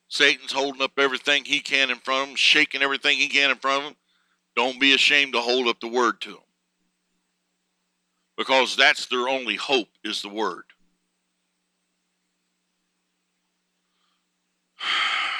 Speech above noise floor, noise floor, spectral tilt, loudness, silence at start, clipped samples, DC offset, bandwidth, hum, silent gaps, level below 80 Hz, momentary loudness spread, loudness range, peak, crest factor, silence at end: 52 dB; -75 dBFS; -1 dB/octave; -21 LUFS; 0.1 s; under 0.1%; under 0.1%; 14.5 kHz; none; none; -84 dBFS; 13 LU; 11 LU; -2 dBFS; 22 dB; 0 s